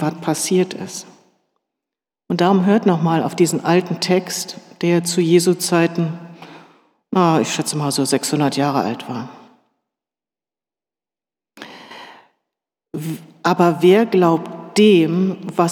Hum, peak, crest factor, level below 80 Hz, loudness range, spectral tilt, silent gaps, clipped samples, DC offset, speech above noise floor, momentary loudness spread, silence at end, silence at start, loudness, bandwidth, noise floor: none; -2 dBFS; 16 dB; -76 dBFS; 11 LU; -5 dB/octave; none; under 0.1%; under 0.1%; over 73 dB; 17 LU; 0 s; 0 s; -17 LUFS; 17.5 kHz; under -90 dBFS